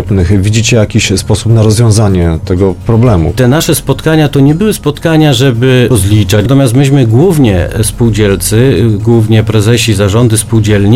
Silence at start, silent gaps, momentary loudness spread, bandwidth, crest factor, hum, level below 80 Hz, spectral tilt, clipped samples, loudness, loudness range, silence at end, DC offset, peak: 0 s; none; 4 LU; 16 kHz; 6 dB; none; -26 dBFS; -6 dB/octave; 1%; -8 LUFS; 1 LU; 0 s; under 0.1%; 0 dBFS